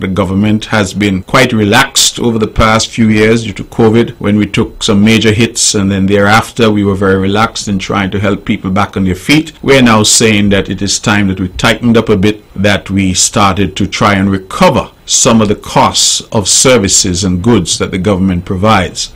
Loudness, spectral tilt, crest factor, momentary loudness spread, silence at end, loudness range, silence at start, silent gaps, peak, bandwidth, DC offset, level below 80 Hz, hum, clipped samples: -9 LUFS; -4 dB/octave; 10 dB; 7 LU; 0.05 s; 2 LU; 0 s; none; 0 dBFS; 16.5 kHz; under 0.1%; -32 dBFS; none; 0.2%